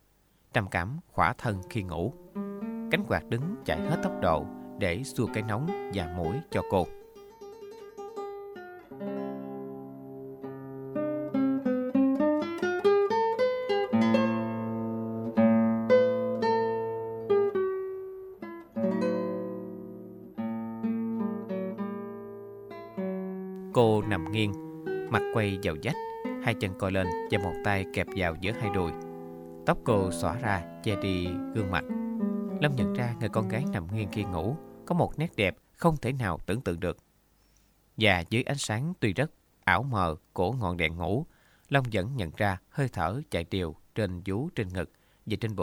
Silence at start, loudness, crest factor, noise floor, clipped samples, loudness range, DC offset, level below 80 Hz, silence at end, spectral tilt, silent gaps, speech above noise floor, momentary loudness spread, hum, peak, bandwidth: 0.55 s; -30 LUFS; 24 dB; -65 dBFS; under 0.1%; 8 LU; under 0.1%; -54 dBFS; 0 s; -6.5 dB/octave; none; 36 dB; 16 LU; none; -6 dBFS; 17.5 kHz